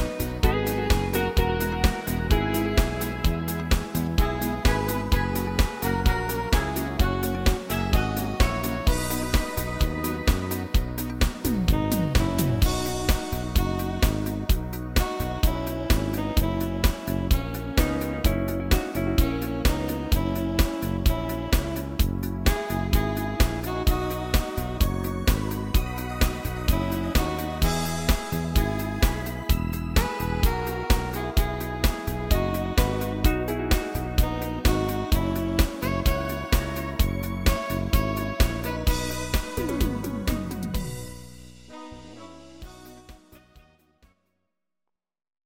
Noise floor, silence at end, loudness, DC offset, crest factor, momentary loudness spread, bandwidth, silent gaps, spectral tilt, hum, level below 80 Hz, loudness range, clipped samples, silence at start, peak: -86 dBFS; 1.85 s; -26 LUFS; under 0.1%; 18 dB; 4 LU; 17 kHz; none; -5.5 dB/octave; none; -28 dBFS; 2 LU; under 0.1%; 0 s; -6 dBFS